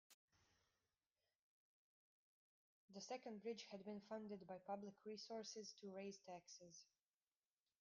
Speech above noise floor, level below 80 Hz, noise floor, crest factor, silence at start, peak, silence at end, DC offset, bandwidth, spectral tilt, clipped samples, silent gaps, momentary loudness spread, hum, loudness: over 35 dB; under -90 dBFS; under -90 dBFS; 20 dB; 0.1 s; -38 dBFS; 0.95 s; under 0.1%; 9.6 kHz; -4 dB/octave; under 0.1%; 0.14-0.28 s, 1.35-2.88 s; 8 LU; none; -55 LUFS